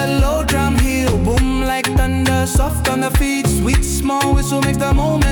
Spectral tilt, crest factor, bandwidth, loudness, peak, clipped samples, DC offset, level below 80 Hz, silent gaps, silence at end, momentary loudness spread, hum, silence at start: -5 dB/octave; 10 dB; 19 kHz; -16 LUFS; -4 dBFS; under 0.1%; under 0.1%; -20 dBFS; none; 0 s; 2 LU; none; 0 s